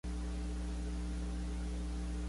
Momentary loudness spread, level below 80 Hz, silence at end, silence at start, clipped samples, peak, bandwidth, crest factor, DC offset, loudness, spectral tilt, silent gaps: 0 LU; -40 dBFS; 0 s; 0.05 s; under 0.1%; -30 dBFS; 11.5 kHz; 8 dB; under 0.1%; -41 LUFS; -6 dB/octave; none